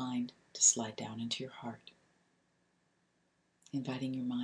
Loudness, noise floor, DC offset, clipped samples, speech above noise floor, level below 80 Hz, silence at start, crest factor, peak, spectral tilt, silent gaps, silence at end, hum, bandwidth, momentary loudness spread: -34 LUFS; -77 dBFS; under 0.1%; under 0.1%; 41 dB; -82 dBFS; 0 s; 24 dB; -14 dBFS; -2.5 dB/octave; none; 0 s; none; 10.5 kHz; 19 LU